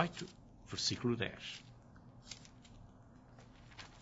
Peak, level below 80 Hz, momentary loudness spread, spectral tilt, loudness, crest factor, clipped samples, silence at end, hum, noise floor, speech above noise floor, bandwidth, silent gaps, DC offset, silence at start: -18 dBFS; -66 dBFS; 23 LU; -3.5 dB/octave; -41 LUFS; 26 dB; under 0.1%; 0 s; none; -60 dBFS; 20 dB; 7.6 kHz; none; under 0.1%; 0 s